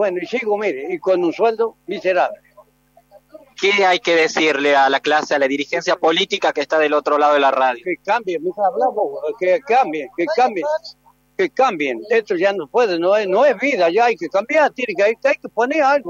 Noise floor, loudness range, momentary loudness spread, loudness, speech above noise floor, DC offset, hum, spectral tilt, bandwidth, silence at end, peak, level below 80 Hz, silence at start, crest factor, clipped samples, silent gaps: -55 dBFS; 3 LU; 8 LU; -17 LUFS; 38 dB; under 0.1%; 50 Hz at -60 dBFS; -3.5 dB/octave; 8 kHz; 0 s; -4 dBFS; -68 dBFS; 0 s; 14 dB; under 0.1%; none